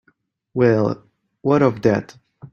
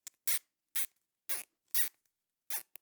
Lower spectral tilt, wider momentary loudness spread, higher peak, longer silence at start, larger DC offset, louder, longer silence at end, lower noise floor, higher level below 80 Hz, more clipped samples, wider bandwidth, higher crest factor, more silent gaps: first, -8.5 dB/octave vs 4.5 dB/octave; first, 11 LU vs 8 LU; first, -2 dBFS vs -12 dBFS; first, 0.55 s vs 0.25 s; neither; first, -19 LUFS vs -34 LUFS; second, 0.05 s vs 0.2 s; second, -63 dBFS vs -83 dBFS; first, -56 dBFS vs under -90 dBFS; neither; second, 7.2 kHz vs over 20 kHz; second, 18 dB vs 26 dB; neither